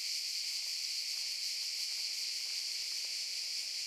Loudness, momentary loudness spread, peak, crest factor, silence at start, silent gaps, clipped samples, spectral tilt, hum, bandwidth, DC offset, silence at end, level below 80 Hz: -35 LUFS; 1 LU; -24 dBFS; 14 dB; 0 s; none; under 0.1%; 6 dB/octave; none; 16.5 kHz; under 0.1%; 0 s; under -90 dBFS